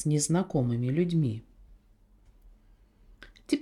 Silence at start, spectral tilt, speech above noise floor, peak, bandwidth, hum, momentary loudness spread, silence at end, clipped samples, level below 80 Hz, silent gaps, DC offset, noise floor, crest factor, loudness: 0 s; -6 dB/octave; 34 dB; -12 dBFS; 13.5 kHz; none; 11 LU; 0 s; under 0.1%; -56 dBFS; none; under 0.1%; -61 dBFS; 18 dB; -28 LUFS